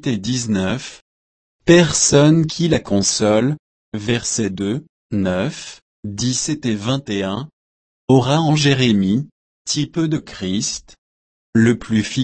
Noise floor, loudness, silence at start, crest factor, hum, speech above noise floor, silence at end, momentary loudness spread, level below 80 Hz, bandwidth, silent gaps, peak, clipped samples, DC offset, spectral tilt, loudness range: under -90 dBFS; -18 LUFS; 0 s; 18 dB; none; over 73 dB; 0 s; 17 LU; -48 dBFS; 8.8 kHz; 1.02-1.59 s, 3.59-3.92 s, 4.89-5.10 s, 5.82-6.03 s, 7.53-8.08 s, 9.32-9.65 s, 10.98-11.53 s; 0 dBFS; under 0.1%; under 0.1%; -4.5 dB/octave; 6 LU